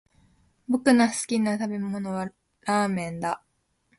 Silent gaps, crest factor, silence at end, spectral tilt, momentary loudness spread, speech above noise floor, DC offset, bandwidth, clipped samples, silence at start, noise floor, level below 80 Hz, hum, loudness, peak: none; 20 dB; 0.6 s; -5 dB/octave; 15 LU; 44 dB; under 0.1%; 11.5 kHz; under 0.1%; 0.7 s; -68 dBFS; -64 dBFS; none; -26 LUFS; -6 dBFS